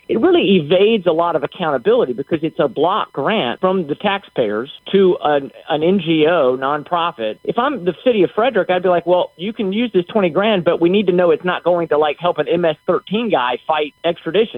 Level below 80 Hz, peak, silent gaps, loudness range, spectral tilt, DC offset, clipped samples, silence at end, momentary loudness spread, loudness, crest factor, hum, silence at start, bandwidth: -58 dBFS; 0 dBFS; none; 2 LU; -8.5 dB/octave; under 0.1%; under 0.1%; 0 s; 6 LU; -17 LUFS; 16 dB; none; 0.1 s; 4.2 kHz